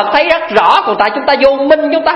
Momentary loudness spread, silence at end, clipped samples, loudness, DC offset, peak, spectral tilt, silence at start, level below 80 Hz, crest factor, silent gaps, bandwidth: 3 LU; 0 s; 0.5%; -10 LUFS; under 0.1%; 0 dBFS; -4.5 dB/octave; 0 s; -46 dBFS; 10 dB; none; 9.8 kHz